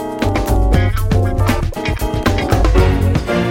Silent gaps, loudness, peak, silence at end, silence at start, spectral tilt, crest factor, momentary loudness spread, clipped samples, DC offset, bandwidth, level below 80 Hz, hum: none; -16 LUFS; 0 dBFS; 0 s; 0 s; -6.5 dB/octave; 14 dB; 5 LU; under 0.1%; under 0.1%; 16.5 kHz; -18 dBFS; none